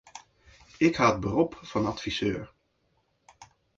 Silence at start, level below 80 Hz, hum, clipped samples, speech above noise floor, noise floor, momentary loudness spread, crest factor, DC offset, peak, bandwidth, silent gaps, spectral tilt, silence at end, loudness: 0.15 s; -54 dBFS; none; under 0.1%; 45 dB; -72 dBFS; 24 LU; 22 dB; under 0.1%; -8 dBFS; 7.8 kHz; none; -5.5 dB/octave; 0.35 s; -27 LUFS